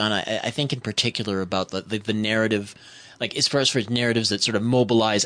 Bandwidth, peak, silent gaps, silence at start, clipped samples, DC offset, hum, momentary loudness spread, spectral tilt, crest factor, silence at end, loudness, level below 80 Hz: 10 kHz; -8 dBFS; none; 0 s; under 0.1%; under 0.1%; none; 9 LU; -4 dB/octave; 16 dB; 0 s; -23 LUFS; -60 dBFS